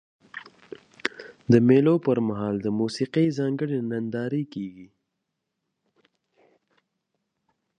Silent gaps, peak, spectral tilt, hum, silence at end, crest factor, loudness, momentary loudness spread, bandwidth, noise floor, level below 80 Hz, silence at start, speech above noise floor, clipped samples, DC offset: none; -4 dBFS; -7.5 dB/octave; none; 2.95 s; 22 dB; -24 LUFS; 23 LU; 9.8 kHz; -81 dBFS; -64 dBFS; 0.35 s; 58 dB; under 0.1%; under 0.1%